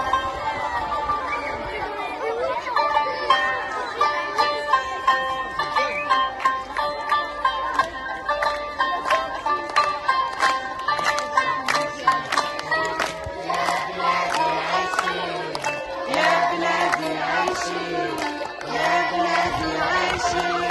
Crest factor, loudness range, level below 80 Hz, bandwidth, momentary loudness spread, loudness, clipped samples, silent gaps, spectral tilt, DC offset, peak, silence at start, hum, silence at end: 20 dB; 2 LU; -50 dBFS; 12 kHz; 6 LU; -23 LUFS; under 0.1%; none; -3 dB/octave; under 0.1%; -4 dBFS; 0 s; none; 0 s